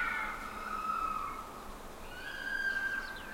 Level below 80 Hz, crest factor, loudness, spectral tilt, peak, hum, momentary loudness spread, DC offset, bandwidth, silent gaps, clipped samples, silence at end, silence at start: -52 dBFS; 16 dB; -37 LUFS; -2.5 dB/octave; -22 dBFS; none; 14 LU; under 0.1%; 16 kHz; none; under 0.1%; 0 s; 0 s